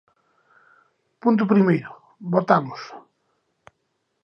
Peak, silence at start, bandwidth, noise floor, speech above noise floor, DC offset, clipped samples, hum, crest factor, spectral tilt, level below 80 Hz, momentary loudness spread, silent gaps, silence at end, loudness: -2 dBFS; 1.25 s; 6.4 kHz; -74 dBFS; 54 dB; under 0.1%; under 0.1%; none; 22 dB; -9 dB/octave; -72 dBFS; 20 LU; none; 1.25 s; -20 LUFS